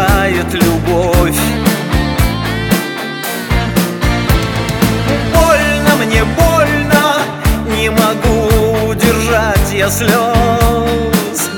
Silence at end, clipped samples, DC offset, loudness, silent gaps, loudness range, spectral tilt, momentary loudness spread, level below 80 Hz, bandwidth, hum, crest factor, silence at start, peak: 0 s; under 0.1%; under 0.1%; -12 LUFS; none; 3 LU; -5 dB/octave; 4 LU; -20 dBFS; over 20 kHz; none; 12 dB; 0 s; 0 dBFS